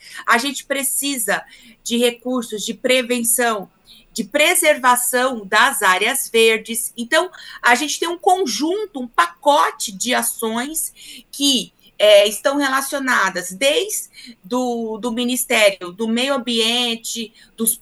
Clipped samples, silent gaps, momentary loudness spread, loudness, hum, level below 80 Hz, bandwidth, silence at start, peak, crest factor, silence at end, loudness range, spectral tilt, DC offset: under 0.1%; none; 11 LU; -17 LUFS; none; -60 dBFS; over 20 kHz; 0.05 s; 0 dBFS; 18 dB; 0.05 s; 4 LU; -1 dB/octave; under 0.1%